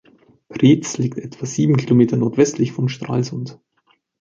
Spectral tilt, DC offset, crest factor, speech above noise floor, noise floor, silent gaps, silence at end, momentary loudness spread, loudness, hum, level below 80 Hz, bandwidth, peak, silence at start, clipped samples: -6.5 dB/octave; under 0.1%; 16 dB; 45 dB; -62 dBFS; none; 0.65 s; 13 LU; -18 LUFS; none; -56 dBFS; 7.6 kHz; -2 dBFS; 0.5 s; under 0.1%